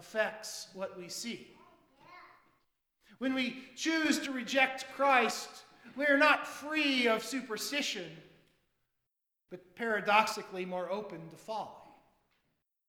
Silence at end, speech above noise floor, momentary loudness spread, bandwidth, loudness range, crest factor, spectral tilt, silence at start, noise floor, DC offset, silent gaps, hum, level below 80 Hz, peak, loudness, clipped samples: 1.05 s; 53 dB; 20 LU; 19 kHz; 9 LU; 24 dB; -2.5 dB/octave; 0 s; -86 dBFS; under 0.1%; none; none; -78 dBFS; -10 dBFS; -32 LUFS; under 0.1%